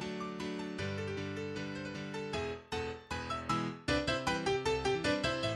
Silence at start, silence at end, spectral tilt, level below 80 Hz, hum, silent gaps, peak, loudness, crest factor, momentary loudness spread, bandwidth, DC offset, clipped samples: 0 s; 0 s; -5 dB/octave; -54 dBFS; none; none; -16 dBFS; -36 LUFS; 20 dB; 8 LU; 13 kHz; under 0.1%; under 0.1%